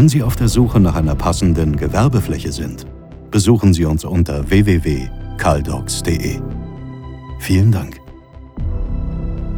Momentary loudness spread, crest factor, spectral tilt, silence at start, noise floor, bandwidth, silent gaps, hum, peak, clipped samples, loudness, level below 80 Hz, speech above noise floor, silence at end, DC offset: 17 LU; 16 dB; -6.5 dB/octave; 0 s; -37 dBFS; 18 kHz; none; none; 0 dBFS; under 0.1%; -16 LUFS; -26 dBFS; 22 dB; 0 s; under 0.1%